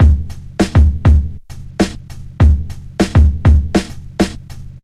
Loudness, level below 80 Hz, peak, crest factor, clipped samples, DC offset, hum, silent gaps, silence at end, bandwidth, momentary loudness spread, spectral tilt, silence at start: -14 LUFS; -16 dBFS; 0 dBFS; 12 dB; under 0.1%; under 0.1%; none; none; 0.1 s; 10.5 kHz; 20 LU; -7 dB/octave; 0 s